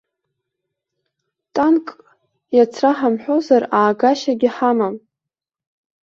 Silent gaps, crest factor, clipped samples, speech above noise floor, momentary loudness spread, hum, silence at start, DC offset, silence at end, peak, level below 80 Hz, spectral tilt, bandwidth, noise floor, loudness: none; 16 dB; under 0.1%; 70 dB; 8 LU; none; 1.55 s; under 0.1%; 1.05 s; -2 dBFS; -66 dBFS; -5.5 dB/octave; 7.4 kHz; -86 dBFS; -17 LUFS